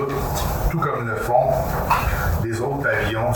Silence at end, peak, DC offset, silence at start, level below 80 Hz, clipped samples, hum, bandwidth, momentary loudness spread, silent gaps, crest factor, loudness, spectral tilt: 0 s; -4 dBFS; under 0.1%; 0 s; -30 dBFS; under 0.1%; none; 19.5 kHz; 5 LU; none; 16 dB; -21 LUFS; -6 dB/octave